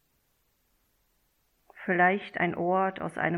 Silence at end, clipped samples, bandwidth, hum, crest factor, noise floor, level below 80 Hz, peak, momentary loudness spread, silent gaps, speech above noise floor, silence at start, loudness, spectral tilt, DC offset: 0 s; under 0.1%; 13.5 kHz; none; 20 dB; -72 dBFS; -70 dBFS; -10 dBFS; 7 LU; none; 45 dB; 1.75 s; -27 LUFS; -7.5 dB/octave; under 0.1%